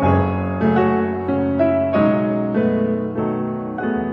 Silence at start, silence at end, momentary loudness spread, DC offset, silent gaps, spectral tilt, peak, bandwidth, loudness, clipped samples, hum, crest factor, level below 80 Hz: 0 s; 0 s; 6 LU; under 0.1%; none; -10.5 dB/octave; -4 dBFS; 5.4 kHz; -19 LUFS; under 0.1%; none; 14 dB; -46 dBFS